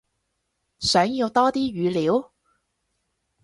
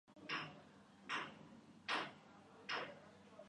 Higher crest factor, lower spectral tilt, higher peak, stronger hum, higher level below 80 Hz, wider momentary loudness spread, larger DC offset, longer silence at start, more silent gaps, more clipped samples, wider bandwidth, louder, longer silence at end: about the same, 20 dB vs 22 dB; first, -4.5 dB/octave vs -3 dB/octave; first, -4 dBFS vs -28 dBFS; neither; first, -56 dBFS vs -86 dBFS; second, 5 LU vs 19 LU; neither; first, 0.8 s vs 0.05 s; neither; neither; about the same, 11.5 kHz vs 10.5 kHz; first, -22 LUFS vs -47 LUFS; first, 1.2 s vs 0 s